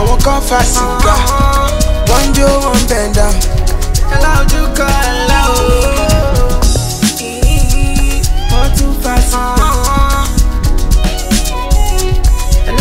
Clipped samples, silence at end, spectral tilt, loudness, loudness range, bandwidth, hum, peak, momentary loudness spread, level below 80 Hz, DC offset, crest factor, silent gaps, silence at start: 0.1%; 0 s; -4.5 dB/octave; -12 LUFS; 2 LU; 16.5 kHz; none; 0 dBFS; 4 LU; -10 dBFS; under 0.1%; 10 dB; none; 0 s